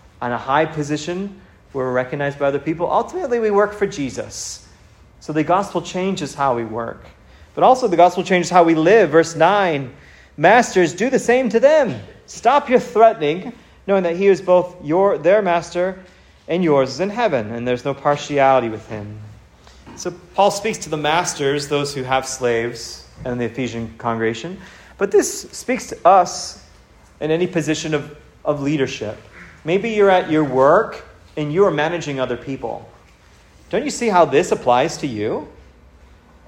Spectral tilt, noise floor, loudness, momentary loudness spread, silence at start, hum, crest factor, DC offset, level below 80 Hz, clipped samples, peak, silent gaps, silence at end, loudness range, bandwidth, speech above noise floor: -5 dB/octave; -49 dBFS; -18 LUFS; 16 LU; 0.2 s; none; 18 dB; under 0.1%; -50 dBFS; under 0.1%; 0 dBFS; none; 0.95 s; 7 LU; 16 kHz; 31 dB